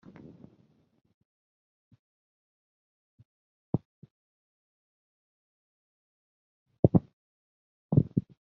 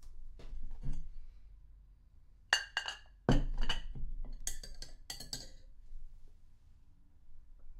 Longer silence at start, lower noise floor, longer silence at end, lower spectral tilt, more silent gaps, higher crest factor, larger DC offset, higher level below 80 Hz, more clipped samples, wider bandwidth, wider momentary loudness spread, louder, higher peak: first, 3.75 s vs 0 s; first, -66 dBFS vs -59 dBFS; first, 0.2 s vs 0 s; first, -14 dB/octave vs -3.5 dB/octave; first, 3.85-4.02 s, 4.11-6.66 s, 6.79-6.83 s, 7.13-7.89 s vs none; about the same, 30 dB vs 28 dB; neither; second, -60 dBFS vs -42 dBFS; neither; second, 2.3 kHz vs 14 kHz; second, 18 LU vs 25 LU; first, -29 LUFS vs -39 LUFS; first, -4 dBFS vs -10 dBFS